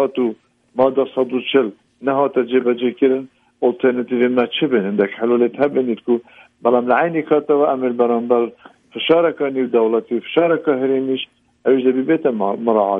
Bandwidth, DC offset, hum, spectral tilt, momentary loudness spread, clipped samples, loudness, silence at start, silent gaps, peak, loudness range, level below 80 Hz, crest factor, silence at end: 3.8 kHz; under 0.1%; none; -8.5 dB/octave; 6 LU; under 0.1%; -18 LUFS; 0 s; none; -2 dBFS; 1 LU; -66 dBFS; 16 dB; 0 s